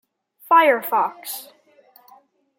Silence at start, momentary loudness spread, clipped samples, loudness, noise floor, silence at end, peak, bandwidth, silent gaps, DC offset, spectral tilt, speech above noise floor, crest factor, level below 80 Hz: 0.5 s; 17 LU; under 0.1%; -18 LUFS; -54 dBFS; 1.15 s; -4 dBFS; 17 kHz; none; under 0.1%; -2 dB/octave; 36 dB; 20 dB; -86 dBFS